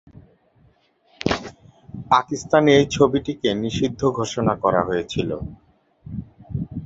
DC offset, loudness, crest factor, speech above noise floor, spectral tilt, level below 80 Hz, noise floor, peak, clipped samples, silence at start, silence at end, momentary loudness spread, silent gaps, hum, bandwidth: under 0.1%; -21 LUFS; 20 dB; 40 dB; -5.5 dB/octave; -46 dBFS; -59 dBFS; -2 dBFS; under 0.1%; 0.15 s; 0 s; 19 LU; none; none; 8 kHz